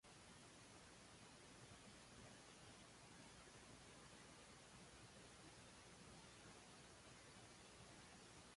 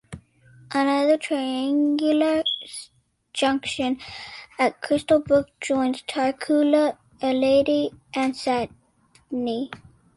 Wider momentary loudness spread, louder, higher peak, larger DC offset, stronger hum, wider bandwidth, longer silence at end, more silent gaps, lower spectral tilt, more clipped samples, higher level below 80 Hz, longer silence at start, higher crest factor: second, 1 LU vs 15 LU; second, -63 LUFS vs -23 LUFS; second, -50 dBFS vs -6 dBFS; neither; neither; about the same, 11.5 kHz vs 11.5 kHz; second, 0 s vs 0.4 s; neither; second, -3 dB/octave vs -4.5 dB/octave; neither; second, -78 dBFS vs -58 dBFS; about the same, 0.05 s vs 0.1 s; about the same, 14 dB vs 16 dB